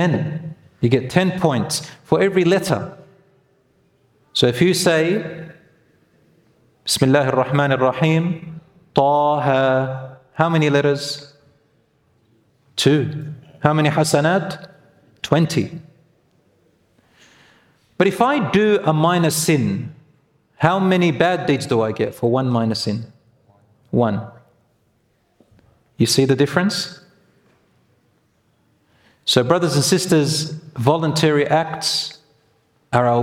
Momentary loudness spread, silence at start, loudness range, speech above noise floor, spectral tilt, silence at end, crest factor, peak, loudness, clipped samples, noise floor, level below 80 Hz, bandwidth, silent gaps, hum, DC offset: 14 LU; 0 s; 5 LU; 46 dB; -5 dB/octave; 0 s; 20 dB; 0 dBFS; -18 LUFS; under 0.1%; -63 dBFS; -58 dBFS; 16.5 kHz; none; none; under 0.1%